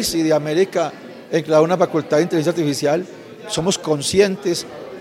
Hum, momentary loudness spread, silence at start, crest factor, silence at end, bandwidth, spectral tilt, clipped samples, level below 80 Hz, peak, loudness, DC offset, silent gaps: none; 10 LU; 0 s; 18 dB; 0 s; 16.5 kHz; -4.5 dB/octave; under 0.1%; -54 dBFS; -2 dBFS; -19 LUFS; under 0.1%; none